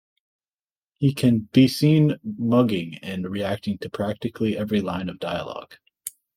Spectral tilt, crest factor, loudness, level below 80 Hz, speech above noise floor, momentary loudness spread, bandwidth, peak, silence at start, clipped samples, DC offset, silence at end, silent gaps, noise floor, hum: -7 dB/octave; 18 dB; -23 LUFS; -60 dBFS; over 68 dB; 13 LU; 16.5 kHz; -4 dBFS; 1 s; under 0.1%; under 0.1%; 0.25 s; none; under -90 dBFS; none